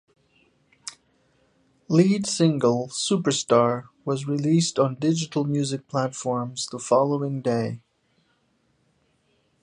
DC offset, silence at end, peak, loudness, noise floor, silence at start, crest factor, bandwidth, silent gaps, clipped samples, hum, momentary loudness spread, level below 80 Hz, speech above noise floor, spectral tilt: under 0.1%; 1.85 s; -4 dBFS; -23 LUFS; -68 dBFS; 0.85 s; 20 dB; 11 kHz; none; under 0.1%; none; 10 LU; -68 dBFS; 45 dB; -5.5 dB/octave